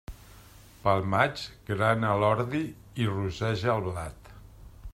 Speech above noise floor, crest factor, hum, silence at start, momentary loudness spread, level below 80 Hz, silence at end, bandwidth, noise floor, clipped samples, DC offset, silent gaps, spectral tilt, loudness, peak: 25 dB; 22 dB; none; 0.1 s; 13 LU; -50 dBFS; 0 s; 15.5 kHz; -52 dBFS; under 0.1%; under 0.1%; none; -6.5 dB/octave; -28 LUFS; -8 dBFS